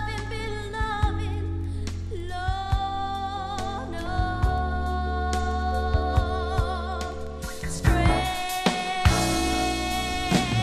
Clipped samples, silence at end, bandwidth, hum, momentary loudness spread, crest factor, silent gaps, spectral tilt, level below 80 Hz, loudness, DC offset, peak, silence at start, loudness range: under 0.1%; 0 s; 14 kHz; none; 9 LU; 20 dB; none; -5 dB/octave; -30 dBFS; -27 LUFS; under 0.1%; -4 dBFS; 0 s; 5 LU